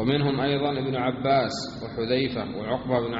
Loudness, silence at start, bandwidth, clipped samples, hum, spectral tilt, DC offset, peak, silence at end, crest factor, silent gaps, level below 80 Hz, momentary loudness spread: -26 LUFS; 0 s; 7.6 kHz; under 0.1%; none; -4.5 dB/octave; under 0.1%; -10 dBFS; 0 s; 16 dB; none; -52 dBFS; 8 LU